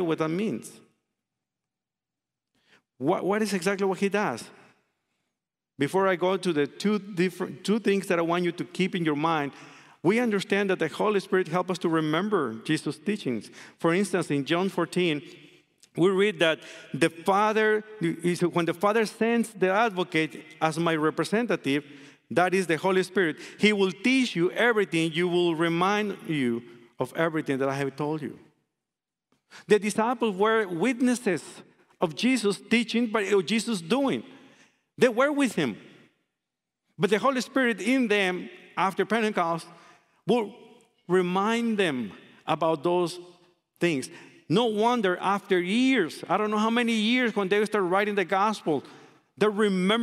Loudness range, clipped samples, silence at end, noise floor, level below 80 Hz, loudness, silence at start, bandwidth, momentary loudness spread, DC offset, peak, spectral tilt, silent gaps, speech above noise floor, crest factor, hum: 4 LU; under 0.1%; 0 s; -90 dBFS; -76 dBFS; -26 LUFS; 0 s; 14.5 kHz; 8 LU; under 0.1%; -6 dBFS; -5 dB/octave; none; 64 dB; 20 dB; none